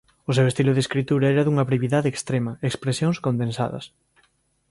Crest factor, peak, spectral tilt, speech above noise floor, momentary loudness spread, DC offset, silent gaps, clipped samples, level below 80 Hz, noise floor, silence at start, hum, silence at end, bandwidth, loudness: 16 dB; -6 dBFS; -6.5 dB/octave; 44 dB; 8 LU; under 0.1%; none; under 0.1%; -58 dBFS; -66 dBFS; 0.3 s; none; 0.85 s; 11.5 kHz; -22 LUFS